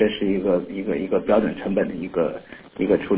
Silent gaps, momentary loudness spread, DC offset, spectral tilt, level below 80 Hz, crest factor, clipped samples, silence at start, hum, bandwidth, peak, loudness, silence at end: none; 7 LU; under 0.1%; -11 dB/octave; -50 dBFS; 16 dB; under 0.1%; 0 s; none; 4 kHz; -6 dBFS; -23 LUFS; 0 s